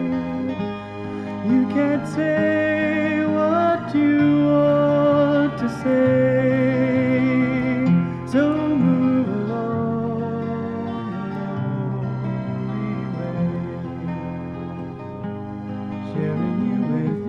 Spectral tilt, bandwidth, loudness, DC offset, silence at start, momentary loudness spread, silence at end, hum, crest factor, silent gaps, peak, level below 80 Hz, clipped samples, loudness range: -9 dB/octave; 8.8 kHz; -21 LUFS; under 0.1%; 0 s; 13 LU; 0 s; none; 14 dB; none; -6 dBFS; -54 dBFS; under 0.1%; 9 LU